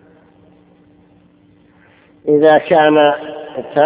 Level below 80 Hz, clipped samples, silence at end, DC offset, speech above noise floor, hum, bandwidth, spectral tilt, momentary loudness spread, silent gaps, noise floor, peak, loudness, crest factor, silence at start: -60 dBFS; under 0.1%; 0 s; under 0.1%; 38 dB; none; 4 kHz; -9.5 dB/octave; 16 LU; none; -50 dBFS; 0 dBFS; -12 LUFS; 16 dB; 2.25 s